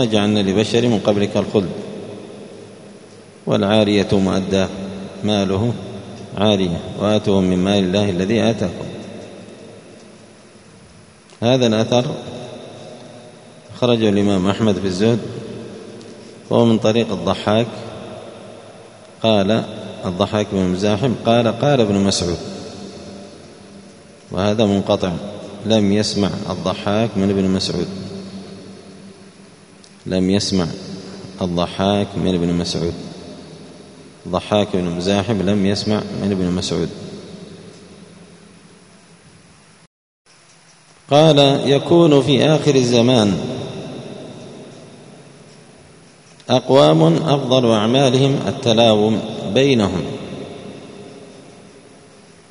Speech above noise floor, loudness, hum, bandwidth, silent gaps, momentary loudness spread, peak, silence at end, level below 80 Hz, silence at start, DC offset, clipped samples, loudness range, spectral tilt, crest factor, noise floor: 33 dB; -17 LUFS; none; 11 kHz; 39.87-40.25 s; 22 LU; 0 dBFS; 1 s; -50 dBFS; 0 s; under 0.1%; under 0.1%; 8 LU; -6 dB/octave; 18 dB; -49 dBFS